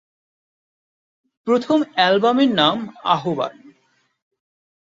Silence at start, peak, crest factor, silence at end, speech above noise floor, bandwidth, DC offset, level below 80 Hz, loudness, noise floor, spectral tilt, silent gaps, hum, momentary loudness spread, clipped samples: 1.45 s; -2 dBFS; 20 dB; 1.45 s; 46 dB; 7.8 kHz; under 0.1%; -66 dBFS; -18 LUFS; -64 dBFS; -5.5 dB/octave; none; none; 10 LU; under 0.1%